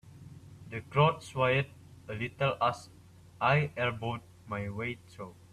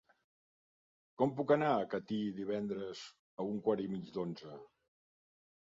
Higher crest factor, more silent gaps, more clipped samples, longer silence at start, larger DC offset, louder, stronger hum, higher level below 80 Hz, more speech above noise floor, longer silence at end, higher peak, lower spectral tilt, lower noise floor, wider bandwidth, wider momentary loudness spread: about the same, 22 dB vs 22 dB; second, none vs 3.19-3.37 s; neither; second, 0.05 s vs 1.2 s; neither; first, -31 LUFS vs -37 LUFS; neither; first, -62 dBFS vs -76 dBFS; second, 19 dB vs over 54 dB; second, 0.2 s vs 1 s; first, -10 dBFS vs -16 dBFS; about the same, -6.5 dB/octave vs -5.5 dB/octave; second, -51 dBFS vs under -90 dBFS; first, 12.5 kHz vs 7.4 kHz; first, 21 LU vs 18 LU